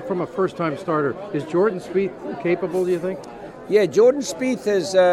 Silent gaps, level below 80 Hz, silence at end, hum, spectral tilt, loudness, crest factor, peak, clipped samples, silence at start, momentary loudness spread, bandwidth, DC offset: none; -60 dBFS; 0 s; none; -5.5 dB/octave; -21 LUFS; 16 dB; -4 dBFS; under 0.1%; 0 s; 11 LU; 13.5 kHz; under 0.1%